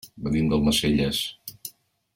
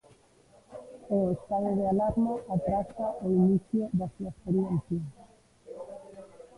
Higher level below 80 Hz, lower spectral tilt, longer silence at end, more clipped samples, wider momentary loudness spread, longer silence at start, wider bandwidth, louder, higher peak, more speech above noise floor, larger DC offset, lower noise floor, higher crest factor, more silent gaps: first, -42 dBFS vs -54 dBFS; second, -5 dB/octave vs -10.5 dB/octave; first, 0.45 s vs 0.15 s; neither; second, 18 LU vs 21 LU; second, 0.05 s vs 0.7 s; first, 17 kHz vs 11 kHz; first, -23 LUFS vs -29 LUFS; first, -10 dBFS vs -14 dBFS; second, 21 dB vs 32 dB; neither; second, -44 dBFS vs -60 dBFS; about the same, 14 dB vs 16 dB; neither